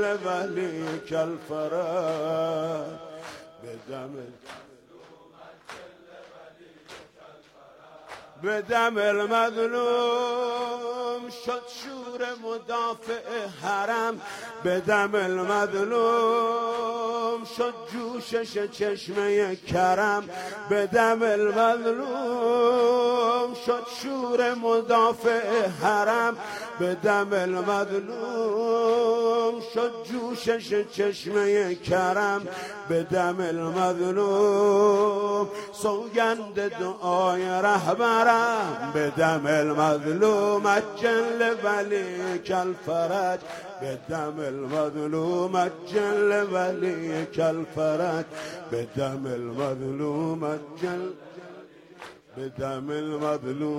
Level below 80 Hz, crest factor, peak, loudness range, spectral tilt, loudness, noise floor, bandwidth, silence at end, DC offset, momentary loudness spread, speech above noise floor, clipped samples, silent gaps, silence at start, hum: -66 dBFS; 20 dB; -6 dBFS; 8 LU; -5 dB/octave; -26 LUFS; -52 dBFS; 16 kHz; 0 s; under 0.1%; 13 LU; 27 dB; under 0.1%; none; 0 s; none